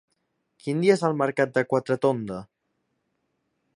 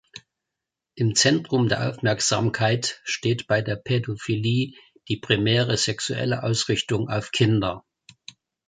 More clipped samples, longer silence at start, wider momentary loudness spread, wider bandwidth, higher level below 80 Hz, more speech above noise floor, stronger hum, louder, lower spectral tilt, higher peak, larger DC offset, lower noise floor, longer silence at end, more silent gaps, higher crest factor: neither; first, 0.65 s vs 0.15 s; first, 14 LU vs 7 LU; first, 11 kHz vs 9.6 kHz; second, -68 dBFS vs -54 dBFS; second, 52 dB vs 62 dB; neither; about the same, -24 LUFS vs -23 LUFS; first, -6.5 dB/octave vs -4.5 dB/octave; second, -6 dBFS vs -2 dBFS; neither; second, -76 dBFS vs -85 dBFS; first, 1.35 s vs 0.85 s; neither; about the same, 20 dB vs 22 dB